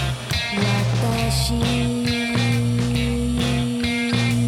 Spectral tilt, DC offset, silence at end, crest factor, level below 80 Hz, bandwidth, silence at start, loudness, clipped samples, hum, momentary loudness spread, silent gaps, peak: -5 dB/octave; under 0.1%; 0 s; 14 dB; -32 dBFS; 15 kHz; 0 s; -21 LUFS; under 0.1%; none; 2 LU; none; -6 dBFS